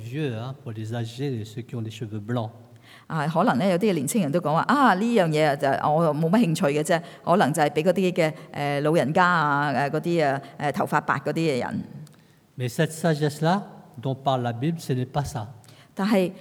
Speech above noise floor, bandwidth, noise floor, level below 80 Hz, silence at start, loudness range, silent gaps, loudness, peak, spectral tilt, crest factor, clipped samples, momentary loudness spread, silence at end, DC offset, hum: 31 dB; 18 kHz; -54 dBFS; -64 dBFS; 0 s; 5 LU; none; -24 LUFS; -4 dBFS; -6 dB/octave; 18 dB; under 0.1%; 13 LU; 0 s; under 0.1%; none